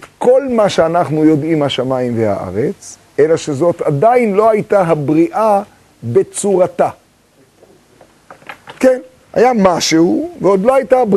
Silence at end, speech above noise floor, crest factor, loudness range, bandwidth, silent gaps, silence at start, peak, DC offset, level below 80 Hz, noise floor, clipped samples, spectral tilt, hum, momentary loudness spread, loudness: 0 s; 38 dB; 12 dB; 4 LU; 13 kHz; none; 0 s; 0 dBFS; under 0.1%; -50 dBFS; -50 dBFS; under 0.1%; -5.5 dB/octave; none; 9 LU; -13 LUFS